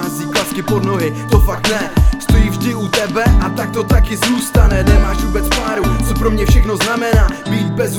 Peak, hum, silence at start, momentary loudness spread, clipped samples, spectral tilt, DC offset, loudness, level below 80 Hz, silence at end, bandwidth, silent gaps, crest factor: 0 dBFS; none; 0 s; 5 LU; under 0.1%; -5.5 dB/octave; under 0.1%; -15 LUFS; -16 dBFS; 0 s; 18.5 kHz; none; 12 dB